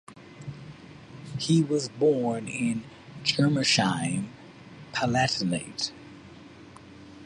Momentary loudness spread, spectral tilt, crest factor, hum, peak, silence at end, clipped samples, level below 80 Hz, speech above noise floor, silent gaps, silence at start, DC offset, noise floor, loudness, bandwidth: 24 LU; -4.5 dB/octave; 20 dB; none; -10 dBFS; 0 s; under 0.1%; -60 dBFS; 22 dB; none; 0.1 s; under 0.1%; -48 dBFS; -26 LUFS; 11.5 kHz